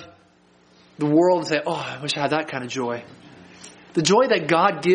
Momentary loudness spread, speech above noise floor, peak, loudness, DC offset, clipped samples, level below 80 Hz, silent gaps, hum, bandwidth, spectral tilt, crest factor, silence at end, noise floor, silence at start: 10 LU; 36 dB; -4 dBFS; -21 LUFS; under 0.1%; under 0.1%; -66 dBFS; none; none; 10 kHz; -4.5 dB/octave; 18 dB; 0 s; -56 dBFS; 0 s